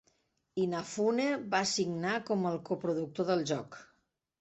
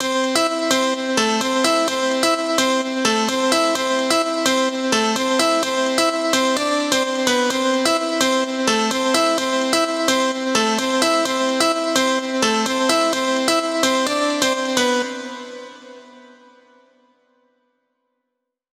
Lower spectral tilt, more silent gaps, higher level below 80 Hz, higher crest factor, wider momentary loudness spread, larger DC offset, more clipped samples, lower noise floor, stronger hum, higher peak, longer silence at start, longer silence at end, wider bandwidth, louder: first, -4.5 dB/octave vs -1.5 dB/octave; neither; second, -74 dBFS vs -64 dBFS; about the same, 18 dB vs 18 dB; first, 7 LU vs 2 LU; neither; neither; about the same, -76 dBFS vs -79 dBFS; neither; second, -16 dBFS vs -2 dBFS; first, 0.55 s vs 0 s; second, 0.55 s vs 2.55 s; second, 8.2 kHz vs 17 kHz; second, -33 LUFS vs -18 LUFS